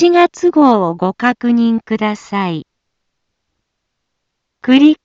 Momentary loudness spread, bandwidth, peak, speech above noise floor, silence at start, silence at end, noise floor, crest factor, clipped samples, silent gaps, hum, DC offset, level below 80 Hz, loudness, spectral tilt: 9 LU; 7.6 kHz; 0 dBFS; 61 dB; 0 s; 0.1 s; -73 dBFS; 14 dB; under 0.1%; none; none; under 0.1%; -60 dBFS; -13 LUFS; -6 dB/octave